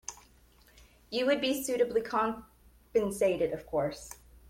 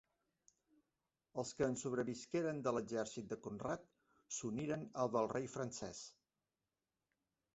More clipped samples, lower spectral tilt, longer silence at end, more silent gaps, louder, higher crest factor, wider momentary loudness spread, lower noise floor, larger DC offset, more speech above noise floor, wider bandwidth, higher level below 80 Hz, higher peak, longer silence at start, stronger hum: neither; second, -4 dB/octave vs -5.5 dB/octave; second, 0.15 s vs 1.45 s; neither; first, -31 LUFS vs -43 LUFS; about the same, 16 dB vs 20 dB; first, 15 LU vs 9 LU; second, -61 dBFS vs under -90 dBFS; neither; second, 31 dB vs over 48 dB; first, 16.5 kHz vs 8 kHz; first, -60 dBFS vs -74 dBFS; first, -16 dBFS vs -24 dBFS; second, 0.1 s vs 1.35 s; neither